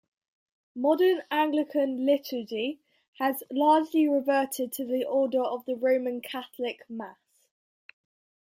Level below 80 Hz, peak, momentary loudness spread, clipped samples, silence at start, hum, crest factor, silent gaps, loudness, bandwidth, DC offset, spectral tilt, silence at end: -82 dBFS; -10 dBFS; 13 LU; under 0.1%; 0.75 s; none; 18 dB; 3.08-3.13 s; -27 LUFS; 16.5 kHz; under 0.1%; -3.5 dB/octave; 1.4 s